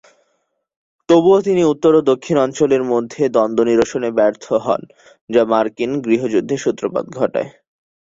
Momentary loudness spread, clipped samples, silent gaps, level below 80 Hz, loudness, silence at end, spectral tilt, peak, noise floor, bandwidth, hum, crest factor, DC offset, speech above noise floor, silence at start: 8 LU; under 0.1%; 5.21-5.28 s; -56 dBFS; -16 LUFS; 0.7 s; -6 dB/octave; -2 dBFS; -68 dBFS; 7.8 kHz; none; 14 dB; under 0.1%; 52 dB; 1.1 s